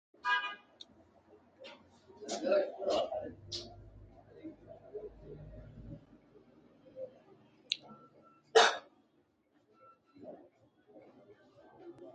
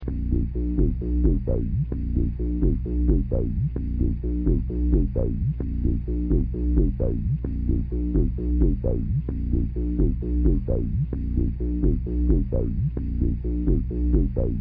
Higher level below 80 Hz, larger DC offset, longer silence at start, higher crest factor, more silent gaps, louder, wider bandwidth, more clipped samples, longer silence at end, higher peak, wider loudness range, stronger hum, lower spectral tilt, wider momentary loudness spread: second, -66 dBFS vs -24 dBFS; neither; first, 0.25 s vs 0 s; first, 30 dB vs 12 dB; neither; second, -34 LUFS vs -25 LUFS; first, 9 kHz vs 2.6 kHz; neither; about the same, 0.05 s vs 0 s; about the same, -10 dBFS vs -10 dBFS; first, 17 LU vs 1 LU; neither; second, -2.5 dB/octave vs -14 dB/octave; first, 26 LU vs 4 LU